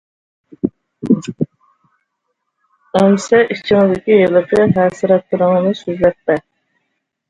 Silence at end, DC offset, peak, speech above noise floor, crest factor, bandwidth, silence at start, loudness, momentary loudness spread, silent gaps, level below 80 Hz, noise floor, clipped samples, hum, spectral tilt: 0.9 s; under 0.1%; 0 dBFS; 59 dB; 16 dB; 10.5 kHz; 0.65 s; -14 LUFS; 12 LU; none; -50 dBFS; -72 dBFS; under 0.1%; none; -6.5 dB/octave